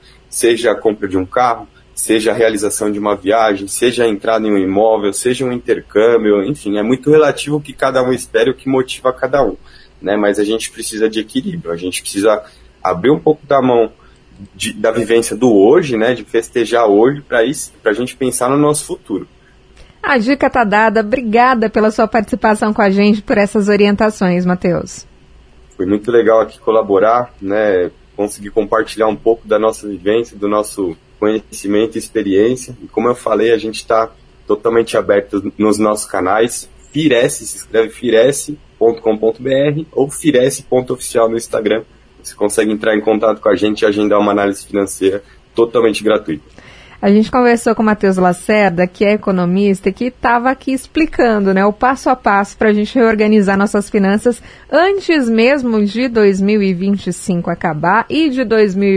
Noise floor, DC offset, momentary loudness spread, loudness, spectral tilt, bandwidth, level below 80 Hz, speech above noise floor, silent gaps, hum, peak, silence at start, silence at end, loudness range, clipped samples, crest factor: -43 dBFS; under 0.1%; 8 LU; -14 LUFS; -5 dB/octave; 11 kHz; -44 dBFS; 29 dB; none; none; 0 dBFS; 0.3 s; 0 s; 3 LU; under 0.1%; 14 dB